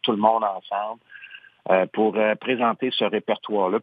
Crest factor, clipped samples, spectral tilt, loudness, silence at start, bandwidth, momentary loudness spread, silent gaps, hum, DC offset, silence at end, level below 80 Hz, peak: 20 dB; under 0.1%; -8.5 dB/octave; -23 LUFS; 0.05 s; 5 kHz; 19 LU; none; none; under 0.1%; 0 s; -84 dBFS; -4 dBFS